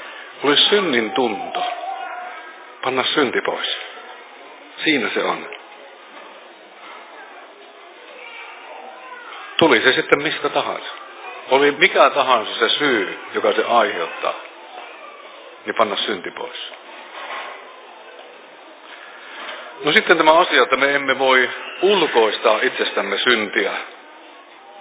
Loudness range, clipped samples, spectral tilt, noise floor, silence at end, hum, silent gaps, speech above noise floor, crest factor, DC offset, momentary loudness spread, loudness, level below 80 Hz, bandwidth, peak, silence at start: 15 LU; under 0.1%; -7 dB/octave; -42 dBFS; 0 s; none; none; 25 dB; 20 dB; under 0.1%; 24 LU; -17 LUFS; -72 dBFS; 4 kHz; 0 dBFS; 0 s